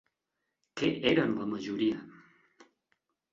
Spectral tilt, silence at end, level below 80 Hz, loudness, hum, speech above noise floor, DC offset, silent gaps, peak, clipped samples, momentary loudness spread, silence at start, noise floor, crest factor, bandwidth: -6 dB/octave; 1.2 s; -68 dBFS; -31 LUFS; none; 55 dB; under 0.1%; none; -12 dBFS; under 0.1%; 11 LU; 0.75 s; -85 dBFS; 22 dB; 7.6 kHz